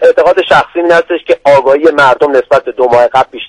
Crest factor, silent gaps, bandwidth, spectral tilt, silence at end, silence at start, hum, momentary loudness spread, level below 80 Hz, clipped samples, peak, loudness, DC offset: 8 dB; none; 11 kHz; -5 dB/octave; 0 s; 0 s; none; 3 LU; -44 dBFS; 0.9%; 0 dBFS; -8 LUFS; under 0.1%